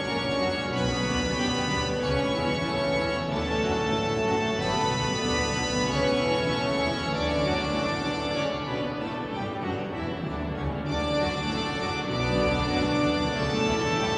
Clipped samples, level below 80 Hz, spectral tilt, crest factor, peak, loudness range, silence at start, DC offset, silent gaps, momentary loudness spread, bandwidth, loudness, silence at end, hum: under 0.1%; -42 dBFS; -5 dB/octave; 14 dB; -12 dBFS; 4 LU; 0 s; under 0.1%; none; 6 LU; 10.5 kHz; -27 LUFS; 0 s; none